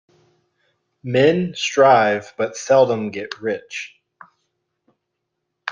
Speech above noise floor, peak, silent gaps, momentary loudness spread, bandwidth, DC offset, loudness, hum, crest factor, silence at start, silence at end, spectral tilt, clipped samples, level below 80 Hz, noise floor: 60 dB; -2 dBFS; none; 18 LU; 7.6 kHz; under 0.1%; -18 LUFS; none; 18 dB; 1.05 s; 0 s; -5 dB/octave; under 0.1%; -64 dBFS; -77 dBFS